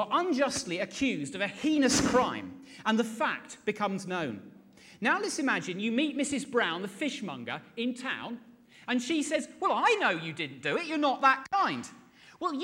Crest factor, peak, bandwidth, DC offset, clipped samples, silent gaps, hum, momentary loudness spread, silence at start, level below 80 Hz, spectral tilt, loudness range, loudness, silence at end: 20 dB; -12 dBFS; 16.5 kHz; under 0.1%; under 0.1%; none; none; 12 LU; 0 s; -62 dBFS; -3.5 dB/octave; 4 LU; -30 LUFS; 0 s